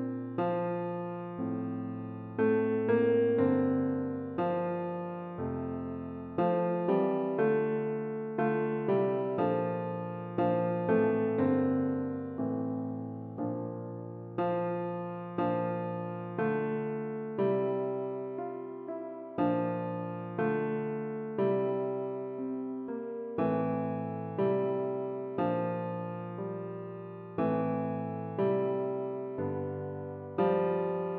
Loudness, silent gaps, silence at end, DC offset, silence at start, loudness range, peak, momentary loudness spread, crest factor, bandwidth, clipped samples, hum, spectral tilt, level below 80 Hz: -32 LUFS; none; 0 s; under 0.1%; 0 s; 4 LU; -16 dBFS; 10 LU; 16 dB; 4.4 kHz; under 0.1%; none; -8 dB/octave; -72 dBFS